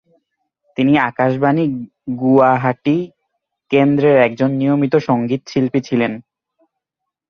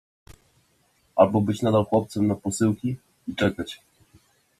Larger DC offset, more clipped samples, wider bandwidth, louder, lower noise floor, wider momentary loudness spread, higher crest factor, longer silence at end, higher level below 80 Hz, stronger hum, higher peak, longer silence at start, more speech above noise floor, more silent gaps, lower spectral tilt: neither; neither; second, 6.6 kHz vs 14 kHz; first, -16 LUFS vs -24 LUFS; first, -81 dBFS vs -65 dBFS; second, 9 LU vs 15 LU; second, 16 dB vs 22 dB; first, 1.1 s vs 0.85 s; about the same, -58 dBFS vs -58 dBFS; neither; first, 0 dBFS vs -4 dBFS; first, 0.8 s vs 0.3 s; first, 66 dB vs 43 dB; neither; first, -8 dB/octave vs -6.5 dB/octave